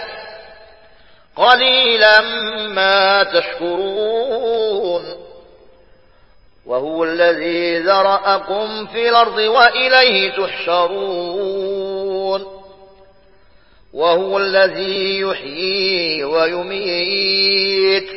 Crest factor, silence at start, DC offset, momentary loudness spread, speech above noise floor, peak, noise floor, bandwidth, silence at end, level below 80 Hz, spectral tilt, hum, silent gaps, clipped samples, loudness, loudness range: 16 dB; 0 s; 0.3%; 12 LU; 36 dB; 0 dBFS; -51 dBFS; 8 kHz; 0 s; -56 dBFS; -5 dB/octave; none; none; under 0.1%; -15 LUFS; 8 LU